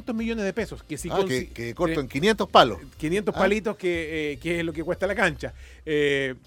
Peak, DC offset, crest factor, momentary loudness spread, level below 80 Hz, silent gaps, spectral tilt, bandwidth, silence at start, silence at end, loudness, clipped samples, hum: -2 dBFS; under 0.1%; 22 dB; 14 LU; -46 dBFS; none; -5 dB/octave; 17 kHz; 0 s; 0.1 s; -25 LUFS; under 0.1%; none